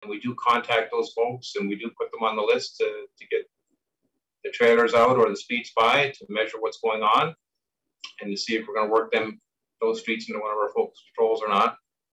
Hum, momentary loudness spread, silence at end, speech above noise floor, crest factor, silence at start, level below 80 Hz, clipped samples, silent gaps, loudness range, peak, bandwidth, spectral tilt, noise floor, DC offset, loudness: none; 12 LU; 0.4 s; 60 dB; 14 dB; 0 s; -70 dBFS; under 0.1%; none; 6 LU; -10 dBFS; 9.6 kHz; -4 dB/octave; -84 dBFS; under 0.1%; -24 LUFS